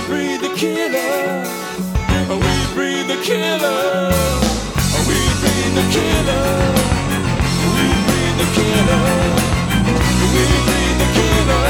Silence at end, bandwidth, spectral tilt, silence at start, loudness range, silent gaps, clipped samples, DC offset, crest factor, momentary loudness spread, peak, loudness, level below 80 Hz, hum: 0 s; 18.5 kHz; -4.5 dB/octave; 0 s; 3 LU; none; under 0.1%; under 0.1%; 14 dB; 5 LU; 0 dBFS; -16 LUFS; -24 dBFS; none